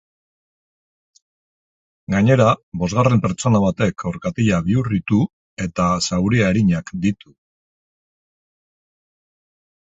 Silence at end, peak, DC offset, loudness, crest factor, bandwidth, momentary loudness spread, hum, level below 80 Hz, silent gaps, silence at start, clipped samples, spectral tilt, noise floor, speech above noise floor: 2.75 s; 0 dBFS; under 0.1%; -19 LUFS; 20 dB; 8 kHz; 9 LU; none; -44 dBFS; 2.63-2.72 s, 5.33-5.57 s; 2.1 s; under 0.1%; -6.5 dB/octave; under -90 dBFS; over 72 dB